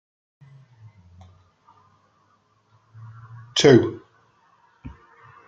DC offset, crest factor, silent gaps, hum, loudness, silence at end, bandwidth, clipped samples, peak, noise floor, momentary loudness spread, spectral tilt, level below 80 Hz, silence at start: under 0.1%; 24 dB; none; none; -18 LUFS; 0.6 s; 9.2 kHz; under 0.1%; -2 dBFS; -64 dBFS; 30 LU; -5 dB/octave; -58 dBFS; 3.55 s